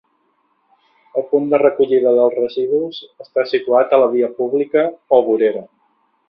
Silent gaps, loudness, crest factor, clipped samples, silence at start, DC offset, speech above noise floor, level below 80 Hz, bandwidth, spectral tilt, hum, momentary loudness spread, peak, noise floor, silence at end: none; -16 LUFS; 16 dB; under 0.1%; 1.15 s; under 0.1%; 48 dB; -64 dBFS; 5.6 kHz; -8.5 dB/octave; none; 10 LU; 0 dBFS; -63 dBFS; 0.65 s